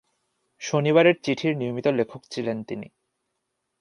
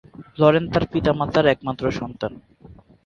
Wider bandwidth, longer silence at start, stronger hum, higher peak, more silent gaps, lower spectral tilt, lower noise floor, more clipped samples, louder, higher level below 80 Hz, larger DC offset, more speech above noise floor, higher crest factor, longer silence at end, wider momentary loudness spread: first, 11 kHz vs 7.2 kHz; first, 0.6 s vs 0.2 s; neither; second, -4 dBFS vs 0 dBFS; neither; second, -6 dB/octave vs -7.5 dB/octave; first, -79 dBFS vs -47 dBFS; neither; about the same, -23 LUFS vs -21 LUFS; second, -70 dBFS vs -44 dBFS; neither; first, 55 dB vs 27 dB; about the same, 22 dB vs 20 dB; first, 0.95 s vs 0.3 s; first, 16 LU vs 13 LU